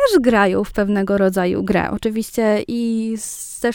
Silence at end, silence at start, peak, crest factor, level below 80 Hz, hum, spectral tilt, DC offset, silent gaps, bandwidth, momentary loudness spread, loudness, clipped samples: 0 s; 0 s; -2 dBFS; 16 dB; -42 dBFS; none; -5.5 dB/octave; under 0.1%; none; 18.5 kHz; 8 LU; -18 LUFS; under 0.1%